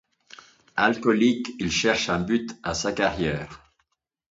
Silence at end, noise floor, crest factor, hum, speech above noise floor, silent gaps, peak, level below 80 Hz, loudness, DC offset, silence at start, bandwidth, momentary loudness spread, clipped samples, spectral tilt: 0.75 s; -73 dBFS; 20 dB; none; 50 dB; none; -6 dBFS; -50 dBFS; -24 LUFS; under 0.1%; 0.75 s; 7.8 kHz; 9 LU; under 0.1%; -4 dB/octave